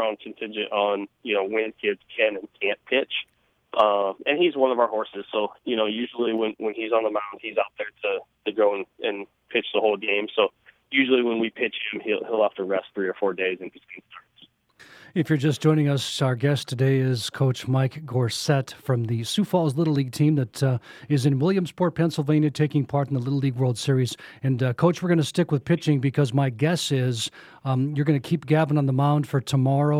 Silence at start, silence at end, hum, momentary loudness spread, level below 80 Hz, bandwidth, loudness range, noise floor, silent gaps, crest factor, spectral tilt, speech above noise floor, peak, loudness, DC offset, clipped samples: 0 s; 0 s; none; 8 LU; -68 dBFS; 15 kHz; 3 LU; -57 dBFS; none; 18 dB; -6.5 dB/octave; 34 dB; -6 dBFS; -24 LUFS; under 0.1%; under 0.1%